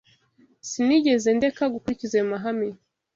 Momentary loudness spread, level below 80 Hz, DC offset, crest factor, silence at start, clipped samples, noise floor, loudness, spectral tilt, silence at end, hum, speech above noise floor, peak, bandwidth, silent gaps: 12 LU; -62 dBFS; under 0.1%; 16 dB; 0.65 s; under 0.1%; -60 dBFS; -24 LUFS; -4.5 dB/octave; 0.4 s; none; 38 dB; -10 dBFS; 8 kHz; none